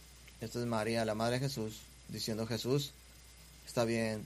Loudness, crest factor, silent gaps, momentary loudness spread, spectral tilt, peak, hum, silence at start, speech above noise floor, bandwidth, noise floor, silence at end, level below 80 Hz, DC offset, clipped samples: -36 LUFS; 20 dB; none; 21 LU; -5 dB/octave; -18 dBFS; none; 0 s; 21 dB; 15.5 kHz; -57 dBFS; 0 s; -60 dBFS; under 0.1%; under 0.1%